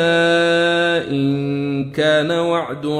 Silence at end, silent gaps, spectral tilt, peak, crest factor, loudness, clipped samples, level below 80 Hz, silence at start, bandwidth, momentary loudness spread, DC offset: 0 s; none; -5.5 dB/octave; -4 dBFS; 12 dB; -17 LUFS; under 0.1%; -56 dBFS; 0 s; 11 kHz; 7 LU; under 0.1%